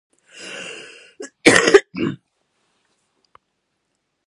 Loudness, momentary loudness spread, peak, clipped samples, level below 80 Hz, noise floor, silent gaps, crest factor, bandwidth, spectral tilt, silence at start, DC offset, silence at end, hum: -15 LUFS; 25 LU; 0 dBFS; under 0.1%; -56 dBFS; -73 dBFS; none; 22 dB; 11.5 kHz; -3 dB/octave; 0.4 s; under 0.1%; 2.1 s; none